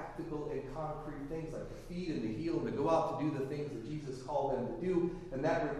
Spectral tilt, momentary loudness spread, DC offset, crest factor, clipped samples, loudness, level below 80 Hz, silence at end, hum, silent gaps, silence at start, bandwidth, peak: -7.5 dB/octave; 10 LU; under 0.1%; 18 dB; under 0.1%; -37 LUFS; -54 dBFS; 0 s; none; none; 0 s; 12.5 kHz; -18 dBFS